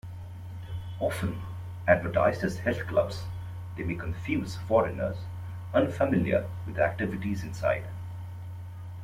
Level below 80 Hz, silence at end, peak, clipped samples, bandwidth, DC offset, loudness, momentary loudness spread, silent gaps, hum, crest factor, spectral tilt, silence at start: -50 dBFS; 0 s; -6 dBFS; under 0.1%; 15.5 kHz; under 0.1%; -30 LUFS; 15 LU; none; none; 24 dB; -7 dB/octave; 0.05 s